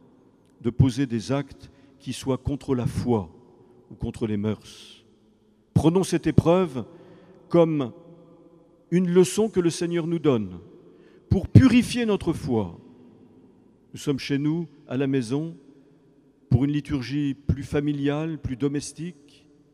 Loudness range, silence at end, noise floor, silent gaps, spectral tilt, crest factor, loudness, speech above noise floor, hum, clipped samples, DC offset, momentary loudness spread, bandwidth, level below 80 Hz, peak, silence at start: 7 LU; 0.6 s; -60 dBFS; none; -7 dB/octave; 24 dB; -24 LUFS; 37 dB; none; under 0.1%; under 0.1%; 16 LU; 14 kHz; -46 dBFS; 0 dBFS; 0.65 s